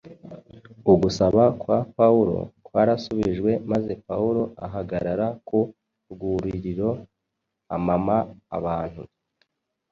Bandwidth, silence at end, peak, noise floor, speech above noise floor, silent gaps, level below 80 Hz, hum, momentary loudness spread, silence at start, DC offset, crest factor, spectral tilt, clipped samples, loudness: 7.4 kHz; 0.85 s; -4 dBFS; -81 dBFS; 58 dB; none; -48 dBFS; none; 14 LU; 0.05 s; under 0.1%; 20 dB; -8 dB/octave; under 0.1%; -23 LUFS